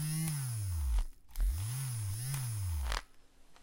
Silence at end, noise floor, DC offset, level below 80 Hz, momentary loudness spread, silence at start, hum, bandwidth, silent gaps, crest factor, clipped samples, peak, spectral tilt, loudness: 0 s; -58 dBFS; under 0.1%; -40 dBFS; 4 LU; 0 s; none; 16.5 kHz; none; 20 dB; under 0.1%; -16 dBFS; -4.5 dB/octave; -38 LUFS